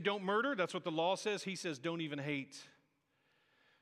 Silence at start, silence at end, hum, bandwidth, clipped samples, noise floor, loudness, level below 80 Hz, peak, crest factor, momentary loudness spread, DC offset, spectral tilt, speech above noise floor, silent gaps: 0 s; 1.15 s; none; 14 kHz; under 0.1%; -78 dBFS; -38 LUFS; under -90 dBFS; -20 dBFS; 18 dB; 7 LU; under 0.1%; -4.5 dB/octave; 40 dB; none